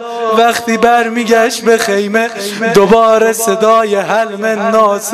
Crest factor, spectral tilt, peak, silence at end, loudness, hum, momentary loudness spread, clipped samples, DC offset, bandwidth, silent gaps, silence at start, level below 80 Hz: 10 dB; -3.5 dB/octave; 0 dBFS; 0 s; -11 LUFS; none; 6 LU; 0.4%; under 0.1%; 15.5 kHz; none; 0 s; -48 dBFS